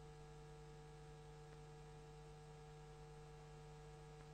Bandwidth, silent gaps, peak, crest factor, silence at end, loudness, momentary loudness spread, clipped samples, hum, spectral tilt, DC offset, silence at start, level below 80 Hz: 9.6 kHz; none; -44 dBFS; 14 dB; 0 s; -60 LUFS; 0 LU; under 0.1%; 50 Hz at -60 dBFS; -5.5 dB/octave; under 0.1%; 0 s; -66 dBFS